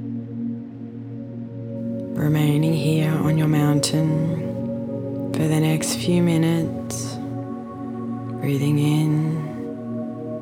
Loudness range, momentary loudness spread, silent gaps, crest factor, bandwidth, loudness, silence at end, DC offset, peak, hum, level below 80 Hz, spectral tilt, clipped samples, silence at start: 4 LU; 13 LU; none; 14 dB; 16 kHz; -22 LUFS; 0 s; under 0.1%; -8 dBFS; none; -56 dBFS; -6.5 dB/octave; under 0.1%; 0 s